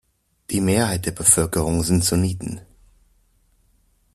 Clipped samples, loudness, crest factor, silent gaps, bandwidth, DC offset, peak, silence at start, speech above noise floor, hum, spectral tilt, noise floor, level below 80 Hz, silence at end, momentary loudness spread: under 0.1%; -19 LUFS; 22 dB; none; 14.5 kHz; under 0.1%; -2 dBFS; 0.5 s; 42 dB; none; -4 dB/octave; -61 dBFS; -42 dBFS; 1.55 s; 14 LU